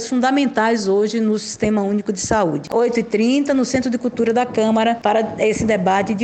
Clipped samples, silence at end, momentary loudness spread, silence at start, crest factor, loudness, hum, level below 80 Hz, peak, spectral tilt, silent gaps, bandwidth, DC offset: under 0.1%; 0 s; 3 LU; 0 s; 16 dB; -18 LUFS; none; -48 dBFS; -2 dBFS; -5 dB/octave; none; 9 kHz; under 0.1%